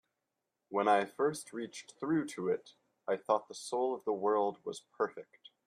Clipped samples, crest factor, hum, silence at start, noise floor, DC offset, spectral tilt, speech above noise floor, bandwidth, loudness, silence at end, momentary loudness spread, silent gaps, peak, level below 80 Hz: under 0.1%; 20 dB; none; 0.7 s; -87 dBFS; under 0.1%; -5 dB/octave; 53 dB; 14.5 kHz; -35 LUFS; 0.45 s; 14 LU; none; -14 dBFS; -82 dBFS